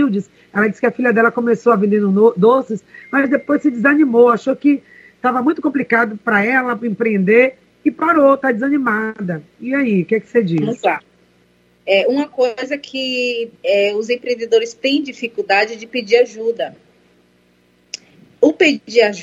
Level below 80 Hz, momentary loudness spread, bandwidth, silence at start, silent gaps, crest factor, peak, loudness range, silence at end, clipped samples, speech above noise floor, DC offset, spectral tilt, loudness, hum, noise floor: -66 dBFS; 11 LU; 7.8 kHz; 0 s; none; 16 dB; 0 dBFS; 5 LU; 0 s; under 0.1%; 40 dB; under 0.1%; -6 dB/octave; -16 LUFS; 60 Hz at -45 dBFS; -55 dBFS